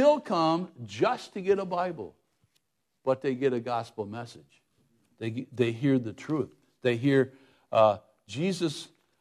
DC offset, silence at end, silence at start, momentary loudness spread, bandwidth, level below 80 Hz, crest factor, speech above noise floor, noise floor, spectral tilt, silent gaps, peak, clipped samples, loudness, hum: under 0.1%; 0.35 s; 0 s; 14 LU; 12.5 kHz; -70 dBFS; 18 dB; 48 dB; -76 dBFS; -6.5 dB/octave; none; -10 dBFS; under 0.1%; -29 LUFS; none